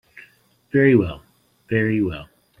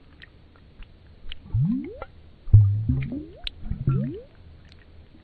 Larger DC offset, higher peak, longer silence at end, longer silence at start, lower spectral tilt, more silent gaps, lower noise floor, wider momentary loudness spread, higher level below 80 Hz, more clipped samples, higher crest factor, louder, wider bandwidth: neither; about the same, -2 dBFS vs -2 dBFS; first, 0.35 s vs 0.2 s; about the same, 0.75 s vs 0.8 s; about the same, -9.5 dB/octave vs -10 dB/octave; neither; first, -56 dBFS vs -51 dBFS; second, 17 LU vs 24 LU; second, -50 dBFS vs -36 dBFS; neither; second, 18 dB vs 24 dB; first, -20 LUFS vs -24 LUFS; first, 5.2 kHz vs 4.5 kHz